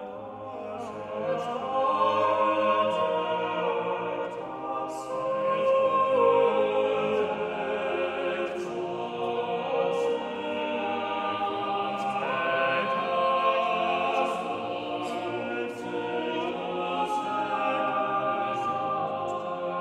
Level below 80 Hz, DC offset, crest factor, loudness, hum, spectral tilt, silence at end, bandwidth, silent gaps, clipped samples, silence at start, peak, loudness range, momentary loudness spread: -70 dBFS; under 0.1%; 16 dB; -28 LUFS; none; -5 dB/octave; 0 s; 10.5 kHz; none; under 0.1%; 0 s; -12 dBFS; 4 LU; 9 LU